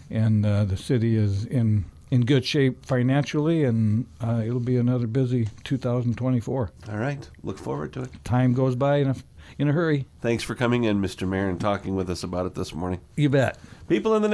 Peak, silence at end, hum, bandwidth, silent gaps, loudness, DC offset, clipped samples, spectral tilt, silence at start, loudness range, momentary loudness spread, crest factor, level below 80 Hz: -8 dBFS; 0 s; none; 11 kHz; none; -25 LUFS; under 0.1%; under 0.1%; -7.5 dB/octave; 0 s; 3 LU; 9 LU; 16 dB; -50 dBFS